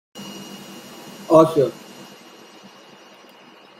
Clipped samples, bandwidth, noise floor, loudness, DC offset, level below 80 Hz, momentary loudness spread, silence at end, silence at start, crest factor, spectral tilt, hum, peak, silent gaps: under 0.1%; 16 kHz; -47 dBFS; -17 LUFS; under 0.1%; -66 dBFS; 26 LU; 2.1 s; 0.15 s; 22 dB; -6.5 dB/octave; none; -2 dBFS; none